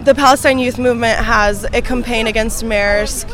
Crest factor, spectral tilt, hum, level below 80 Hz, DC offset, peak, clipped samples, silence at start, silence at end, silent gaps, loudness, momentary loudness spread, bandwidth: 14 dB; -3.5 dB/octave; none; -26 dBFS; under 0.1%; 0 dBFS; 0.4%; 0 s; 0 s; none; -14 LUFS; 7 LU; 18.5 kHz